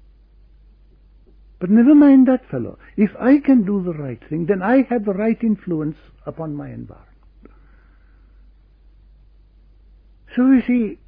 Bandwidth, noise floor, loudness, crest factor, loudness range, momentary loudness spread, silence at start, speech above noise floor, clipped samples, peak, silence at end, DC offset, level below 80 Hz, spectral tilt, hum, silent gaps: 3.6 kHz; -50 dBFS; -17 LUFS; 16 dB; 20 LU; 18 LU; 1.6 s; 33 dB; under 0.1%; -4 dBFS; 0.15 s; under 0.1%; -48 dBFS; -11.5 dB/octave; none; none